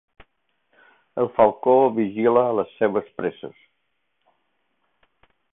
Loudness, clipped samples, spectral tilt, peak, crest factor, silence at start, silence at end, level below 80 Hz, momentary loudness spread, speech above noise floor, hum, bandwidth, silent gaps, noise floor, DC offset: -21 LUFS; under 0.1%; -11 dB/octave; -2 dBFS; 20 dB; 1.15 s; 2.05 s; -64 dBFS; 14 LU; 55 dB; none; 3.9 kHz; none; -75 dBFS; under 0.1%